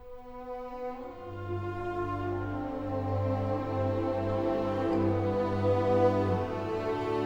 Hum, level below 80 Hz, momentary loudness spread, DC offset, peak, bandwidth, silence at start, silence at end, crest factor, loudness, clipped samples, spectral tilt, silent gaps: none; -52 dBFS; 14 LU; under 0.1%; -14 dBFS; 7.6 kHz; 0 s; 0 s; 16 dB; -31 LUFS; under 0.1%; -8.5 dB/octave; none